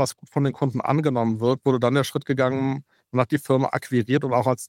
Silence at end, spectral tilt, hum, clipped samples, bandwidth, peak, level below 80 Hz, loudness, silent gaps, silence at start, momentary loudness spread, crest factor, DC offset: 0 s; -6.5 dB/octave; none; under 0.1%; 16.5 kHz; -4 dBFS; -64 dBFS; -23 LUFS; none; 0 s; 4 LU; 18 dB; under 0.1%